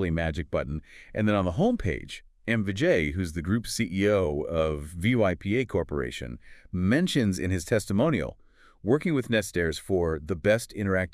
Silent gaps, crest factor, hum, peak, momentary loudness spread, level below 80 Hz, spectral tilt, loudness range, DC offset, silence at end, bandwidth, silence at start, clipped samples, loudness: none; 16 dB; none; -10 dBFS; 11 LU; -46 dBFS; -6 dB/octave; 1 LU; under 0.1%; 0.05 s; 15 kHz; 0 s; under 0.1%; -27 LUFS